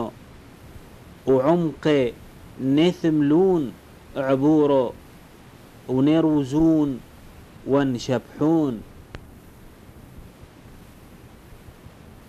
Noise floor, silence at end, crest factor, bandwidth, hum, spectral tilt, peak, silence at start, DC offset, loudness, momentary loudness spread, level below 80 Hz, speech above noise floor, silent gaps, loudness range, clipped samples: -46 dBFS; 1 s; 16 dB; 13.5 kHz; none; -7.5 dB/octave; -8 dBFS; 0 s; under 0.1%; -21 LUFS; 18 LU; -48 dBFS; 27 dB; none; 6 LU; under 0.1%